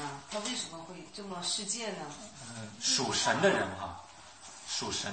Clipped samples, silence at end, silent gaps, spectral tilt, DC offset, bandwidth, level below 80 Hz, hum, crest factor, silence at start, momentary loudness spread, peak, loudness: under 0.1%; 0 s; none; -2 dB/octave; under 0.1%; 8.8 kHz; -68 dBFS; none; 20 dB; 0 s; 18 LU; -14 dBFS; -32 LUFS